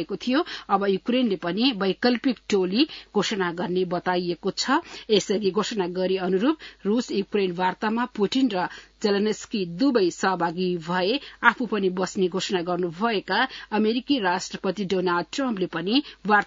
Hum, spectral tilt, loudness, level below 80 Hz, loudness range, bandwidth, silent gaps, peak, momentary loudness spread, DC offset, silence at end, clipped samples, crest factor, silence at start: none; -5 dB/octave; -24 LUFS; -62 dBFS; 1 LU; 7.8 kHz; none; 0 dBFS; 4 LU; under 0.1%; 0 s; under 0.1%; 24 dB; 0 s